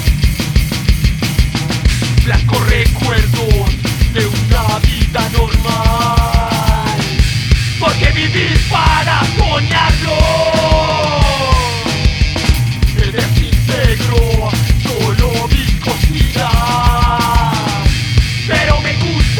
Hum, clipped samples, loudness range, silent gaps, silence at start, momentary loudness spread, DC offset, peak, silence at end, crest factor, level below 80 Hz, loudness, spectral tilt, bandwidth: none; under 0.1%; 2 LU; none; 0 s; 3 LU; under 0.1%; 0 dBFS; 0 s; 12 dB; -16 dBFS; -13 LUFS; -5 dB/octave; 19.5 kHz